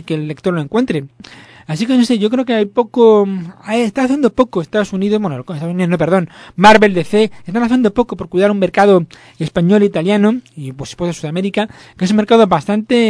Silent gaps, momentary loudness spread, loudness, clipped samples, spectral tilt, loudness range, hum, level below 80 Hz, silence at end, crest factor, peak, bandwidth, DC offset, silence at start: none; 12 LU; -14 LUFS; 0.4%; -6.5 dB/octave; 3 LU; none; -46 dBFS; 0 s; 14 dB; 0 dBFS; 11 kHz; under 0.1%; 0.05 s